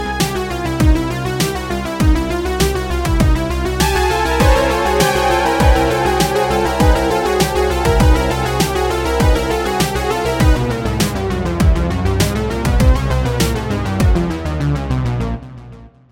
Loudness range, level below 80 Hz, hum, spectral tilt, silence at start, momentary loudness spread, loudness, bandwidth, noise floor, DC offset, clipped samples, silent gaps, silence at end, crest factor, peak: 3 LU; -20 dBFS; none; -5.5 dB/octave; 0 s; 6 LU; -16 LUFS; 17 kHz; -37 dBFS; under 0.1%; under 0.1%; none; 0.25 s; 14 dB; 0 dBFS